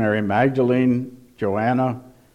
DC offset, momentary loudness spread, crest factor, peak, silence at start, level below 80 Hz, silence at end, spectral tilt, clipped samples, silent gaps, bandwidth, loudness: under 0.1%; 10 LU; 16 dB; -6 dBFS; 0 s; -60 dBFS; 0.25 s; -9 dB/octave; under 0.1%; none; 6.6 kHz; -20 LUFS